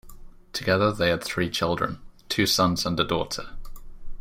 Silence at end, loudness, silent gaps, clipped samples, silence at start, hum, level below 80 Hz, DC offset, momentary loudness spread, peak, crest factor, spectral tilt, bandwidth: 0 s; -25 LUFS; none; under 0.1%; 0.05 s; none; -42 dBFS; under 0.1%; 12 LU; -6 dBFS; 20 dB; -4 dB/octave; 16.5 kHz